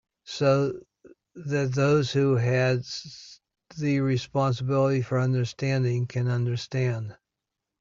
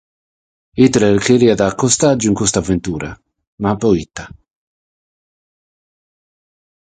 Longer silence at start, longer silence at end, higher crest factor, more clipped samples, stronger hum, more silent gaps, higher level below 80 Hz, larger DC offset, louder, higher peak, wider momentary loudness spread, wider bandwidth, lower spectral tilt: second, 0.25 s vs 0.75 s; second, 0.65 s vs 2.65 s; about the same, 16 dB vs 18 dB; neither; neither; second, none vs 3.47-3.58 s; second, -62 dBFS vs -42 dBFS; neither; second, -26 LUFS vs -14 LUFS; second, -10 dBFS vs 0 dBFS; about the same, 15 LU vs 16 LU; second, 7.6 kHz vs 9.6 kHz; first, -7 dB/octave vs -5 dB/octave